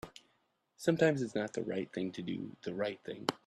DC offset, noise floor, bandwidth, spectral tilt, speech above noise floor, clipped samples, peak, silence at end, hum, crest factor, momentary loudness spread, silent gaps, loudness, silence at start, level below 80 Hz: under 0.1%; -77 dBFS; 13.5 kHz; -5.5 dB/octave; 42 dB; under 0.1%; -12 dBFS; 0.1 s; none; 24 dB; 11 LU; none; -36 LUFS; 0.05 s; -72 dBFS